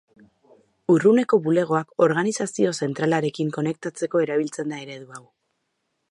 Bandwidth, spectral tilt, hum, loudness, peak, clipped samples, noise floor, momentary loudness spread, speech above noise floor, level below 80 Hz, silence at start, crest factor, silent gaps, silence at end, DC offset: 11.5 kHz; -6 dB/octave; none; -22 LUFS; -4 dBFS; under 0.1%; -75 dBFS; 14 LU; 53 dB; -72 dBFS; 0.9 s; 18 dB; none; 0.9 s; under 0.1%